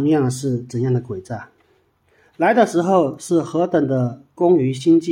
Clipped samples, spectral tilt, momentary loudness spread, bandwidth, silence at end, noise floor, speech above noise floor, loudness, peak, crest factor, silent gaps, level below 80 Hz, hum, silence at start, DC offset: under 0.1%; -7 dB/octave; 10 LU; 12 kHz; 0 s; -60 dBFS; 43 dB; -19 LUFS; -2 dBFS; 16 dB; none; -62 dBFS; none; 0 s; under 0.1%